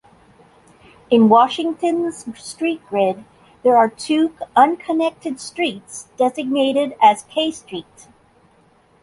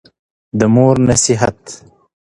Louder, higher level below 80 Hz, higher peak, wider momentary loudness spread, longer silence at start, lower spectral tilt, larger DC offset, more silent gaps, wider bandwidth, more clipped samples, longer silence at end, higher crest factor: second, -18 LUFS vs -12 LUFS; second, -62 dBFS vs -40 dBFS; about the same, -2 dBFS vs 0 dBFS; about the same, 17 LU vs 19 LU; first, 1.1 s vs 0.55 s; about the same, -4.5 dB/octave vs -5 dB/octave; neither; neither; about the same, 11.5 kHz vs 11.5 kHz; neither; first, 1.2 s vs 0.55 s; about the same, 18 dB vs 14 dB